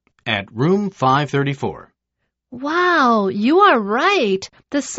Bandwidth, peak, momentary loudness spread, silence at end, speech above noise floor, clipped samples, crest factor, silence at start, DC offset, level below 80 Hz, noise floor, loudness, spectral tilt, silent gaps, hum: 8 kHz; -2 dBFS; 11 LU; 0 s; 59 dB; under 0.1%; 16 dB; 0.25 s; under 0.1%; -58 dBFS; -76 dBFS; -17 LUFS; -4 dB/octave; none; none